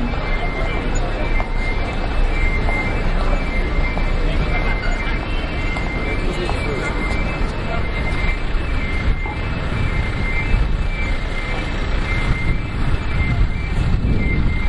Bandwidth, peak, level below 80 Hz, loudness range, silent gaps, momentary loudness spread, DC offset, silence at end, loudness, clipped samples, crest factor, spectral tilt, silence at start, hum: 10.5 kHz; -4 dBFS; -20 dBFS; 1 LU; none; 3 LU; under 0.1%; 0 s; -22 LUFS; under 0.1%; 14 dB; -6.5 dB/octave; 0 s; none